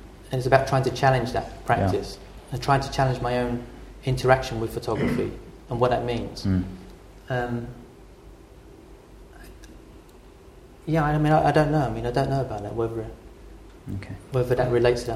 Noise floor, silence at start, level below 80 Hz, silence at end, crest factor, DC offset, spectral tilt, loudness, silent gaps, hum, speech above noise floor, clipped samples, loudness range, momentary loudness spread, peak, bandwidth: -48 dBFS; 0 s; -42 dBFS; 0 s; 24 dB; under 0.1%; -6.5 dB/octave; -24 LUFS; none; none; 24 dB; under 0.1%; 11 LU; 18 LU; -2 dBFS; 14.5 kHz